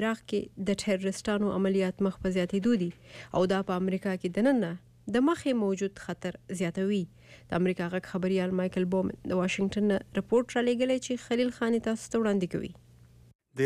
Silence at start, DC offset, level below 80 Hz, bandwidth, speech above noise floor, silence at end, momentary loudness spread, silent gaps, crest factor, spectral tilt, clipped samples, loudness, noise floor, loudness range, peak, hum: 0 s; under 0.1%; -58 dBFS; 13 kHz; 27 dB; 0 s; 8 LU; 13.35-13.39 s; 14 dB; -6 dB/octave; under 0.1%; -29 LUFS; -56 dBFS; 2 LU; -16 dBFS; none